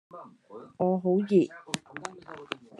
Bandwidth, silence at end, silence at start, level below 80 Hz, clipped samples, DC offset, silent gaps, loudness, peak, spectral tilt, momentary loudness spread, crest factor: 11.5 kHz; 0.25 s; 0.15 s; -76 dBFS; under 0.1%; under 0.1%; none; -28 LUFS; -4 dBFS; -6.5 dB/octave; 24 LU; 26 dB